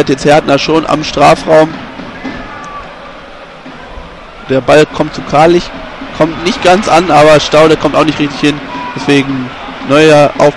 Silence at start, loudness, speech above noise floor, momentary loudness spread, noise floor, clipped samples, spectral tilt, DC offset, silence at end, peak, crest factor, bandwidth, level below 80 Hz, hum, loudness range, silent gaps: 0 s; -8 LUFS; 22 dB; 23 LU; -29 dBFS; 1%; -5 dB/octave; under 0.1%; 0 s; 0 dBFS; 10 dB; 12 kHz; -34 dBFS; none; 7 LU; none